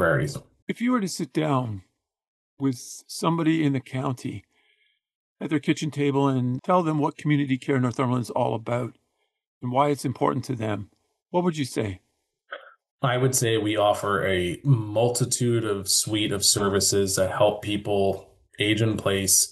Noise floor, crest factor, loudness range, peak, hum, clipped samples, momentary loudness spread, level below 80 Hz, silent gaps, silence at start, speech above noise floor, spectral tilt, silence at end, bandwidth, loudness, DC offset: -68 dBFS; 20 dB; 6 LU; -6 dBFS; none; under 0.1%; 13 LU; -60 dBFS; 0.62-0.67 s, 2.28-2.57 s, 5.15-5.36 s, 9.47-9.61 s, 12.91-12.99 s; 0 s; 44 dB; -4.5 dB/octave; 0 s; 12.5 kHz; -24 LUFS; under 0.1%